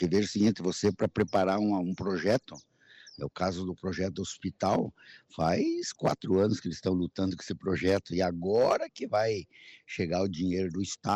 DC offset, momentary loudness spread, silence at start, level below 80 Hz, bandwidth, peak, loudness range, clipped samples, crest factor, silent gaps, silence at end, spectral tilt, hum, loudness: under 0.1%; 9 LU; 0 s; -60 dBFS; 11 kHz; -16 dBFS; 3 LU; under 0.1%; 14 dB; none; 0 s; -6 dB/octave; none; -30 LUFS